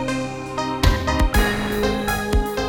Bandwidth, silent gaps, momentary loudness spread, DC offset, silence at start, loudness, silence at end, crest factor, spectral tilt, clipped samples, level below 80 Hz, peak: 18.5 kHz; none; 7 LU; under 0.1%; 0 s; -21 LUFS; 0 s; 16 dB; -5 dB/octave; under 0.1%; -24 dBFS; -4 dBFS